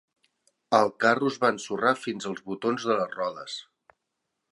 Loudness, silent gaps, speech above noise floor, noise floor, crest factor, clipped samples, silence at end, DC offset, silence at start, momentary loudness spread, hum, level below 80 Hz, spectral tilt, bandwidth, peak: -26 LUFS; none; 56 dB; -82 dBFS; 24 dB; under 0.1%; 0.9 s; under 0.1%; 0.7 s; 11 LU; none; -76 dBFS; -4.5 dB/octave; 11.5 kHz; -4 dBFS